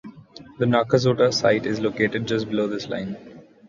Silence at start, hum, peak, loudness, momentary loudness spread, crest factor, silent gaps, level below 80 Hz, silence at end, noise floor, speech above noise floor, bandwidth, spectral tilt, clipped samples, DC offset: 0.05 s; none; -4 dBFS; -22 LUFS; 12 LU; 18 dB; none; -56 dBFS; 0.25 s; -45 dBFS; 23 dB; 7.6 kHz; -5.5 dB/octave; under 0.1%; under 0.1%